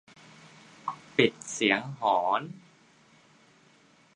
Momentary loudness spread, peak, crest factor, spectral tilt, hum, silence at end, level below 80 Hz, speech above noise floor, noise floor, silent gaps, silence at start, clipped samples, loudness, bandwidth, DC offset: 14 LU; -6 dBFS; 24 dB; -3.5 dB/octave; none; 1.6 s; -74 dBFS; 34 dB; -61 dBFS; none; 0.85 s; under 0.1%; -28 LUFS; 10.5 kHz; under 0.1%